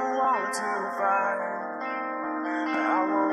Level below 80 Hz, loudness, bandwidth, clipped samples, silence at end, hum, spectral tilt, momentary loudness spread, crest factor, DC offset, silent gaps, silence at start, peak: -82 dBFS; -27 LUFS; 12.5 kHz; under 0.1%; 0 s; none; -4 dB/octave; 7 LU; 14 dB; under 0.1%; none; 0 s; -12 dBFS